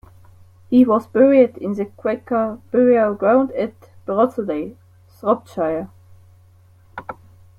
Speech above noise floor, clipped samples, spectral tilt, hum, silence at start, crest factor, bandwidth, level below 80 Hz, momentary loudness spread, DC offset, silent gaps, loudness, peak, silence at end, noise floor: 33 dB; under 0.1%; -8.5 dB/octave; none; 0.7 s; 16 dB; 5 kHz; -58 dBFS; 20 LU; under 0.1%; none; -18 LUFS; -2 dBFS; 0.45 s; -50 dBFS